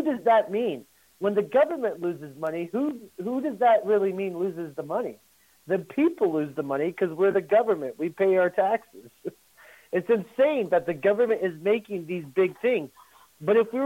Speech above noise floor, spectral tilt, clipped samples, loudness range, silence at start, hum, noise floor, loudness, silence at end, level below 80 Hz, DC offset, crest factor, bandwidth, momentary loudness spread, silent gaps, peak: 29 dB; -7 dB/octave; under 0.1%; 2 LU; 0 s; none; -54 dBFS; -25 LUFS; 0 s; -72 dBFS; under 0.1%; 16 dB; 16.5 kHz; 11 LU; none; -10 dBFS